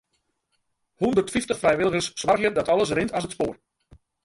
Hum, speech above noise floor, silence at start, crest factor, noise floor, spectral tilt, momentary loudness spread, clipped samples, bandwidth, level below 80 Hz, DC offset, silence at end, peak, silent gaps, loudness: none; 51 dB; 1 s; 18 dB; -74 dBFS; -4.5 dB/octave; 7 LU; under 0.1%; 11.5 kHz; -54 dBFS; under 0.1%; 0.7 s; -8 dBFS; none; -24 LUFS